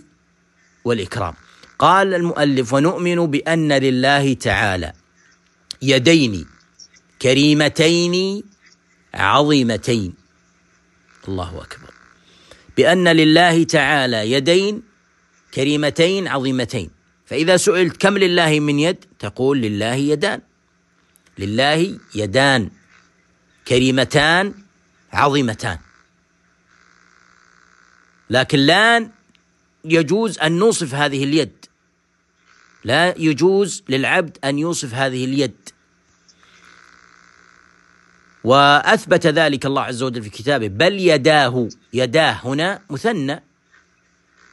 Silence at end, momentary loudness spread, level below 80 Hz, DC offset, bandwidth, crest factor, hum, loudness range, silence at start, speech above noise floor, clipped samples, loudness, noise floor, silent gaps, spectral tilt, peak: 1.15 s; 14 LU; -50 dBFS; under 0.1%; 12.5 kHz; 18 dB; none; 6 LU; 0.85 s; 47 dB; under 0.1%; -16 LUFS; -63 dBFS; none; -4.5 dB/octave; 0 dBFS